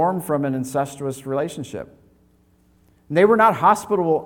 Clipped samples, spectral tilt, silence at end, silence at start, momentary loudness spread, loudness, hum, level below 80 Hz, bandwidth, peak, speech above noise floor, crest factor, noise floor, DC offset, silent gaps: under 0.1%; -6 dB/octave; 0 s; 0 s; 17 LU; -20 LUFS; none; -60 dBFS; 19 kHz; -4 dBFS; 38 dB; 18 dB; -58 dBFS; under 0.1%; none